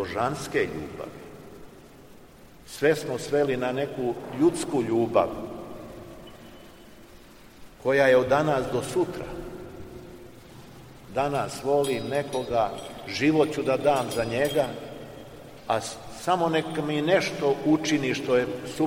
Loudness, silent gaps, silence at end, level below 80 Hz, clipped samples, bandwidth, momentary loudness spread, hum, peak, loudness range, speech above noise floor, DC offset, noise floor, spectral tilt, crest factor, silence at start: -26 LUFS; none; 0 s; -54 dBFS; under 0.1%; 16.5 kHz; 21 LU; none; -8 dBFS; 5 LU; 25 dB; 0.1%; -50 dBFS; -5 dB/octave; 20 dB; 0 s